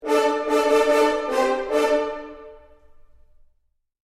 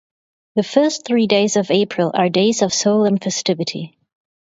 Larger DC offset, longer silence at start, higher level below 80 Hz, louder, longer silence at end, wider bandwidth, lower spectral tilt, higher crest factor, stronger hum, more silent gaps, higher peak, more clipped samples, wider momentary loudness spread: neither; second, 0 s vs 0.55 s; first, -54 dBFS vs -64 dBFS; second, -21 LUFS vs -17 LUFS; first, 1.6 s vs 0.55 s; first, 15 kHz vs 8 kHz; second, -2.5 dB/octave vs -4.5 dB/octave; about the same, 16 dB vs 18 dB; neither; neither; second, -8 dBFS vs 0 dBFS; neither; first, 11 LU vs 8 LU